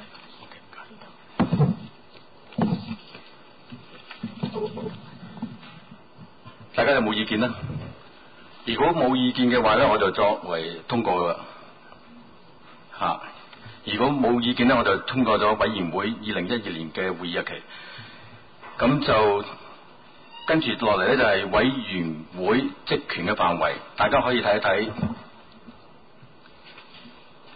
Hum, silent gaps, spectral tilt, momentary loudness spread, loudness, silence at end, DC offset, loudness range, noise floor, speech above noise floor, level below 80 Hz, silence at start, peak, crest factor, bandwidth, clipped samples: none; none; -10.5 dB/octave; 24 LU; -23 LUFS; 0.45 s; 0.3%; 8 LU; -52 dBFS; 29 dB; -52 dBFS; 0 s; -10 dBFS; 16 dB; 5 kHz; under 0.1%